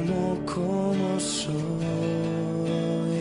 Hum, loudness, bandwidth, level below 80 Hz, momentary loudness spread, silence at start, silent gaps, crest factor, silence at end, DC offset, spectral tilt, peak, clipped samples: none; -27 LUFS; 11 kHz; -54 dBFS; 3 LU; 0 s; none; 12 dB; 0 s; under 0.1%; -6 dB/octave; -14 dBFS; under 0.1%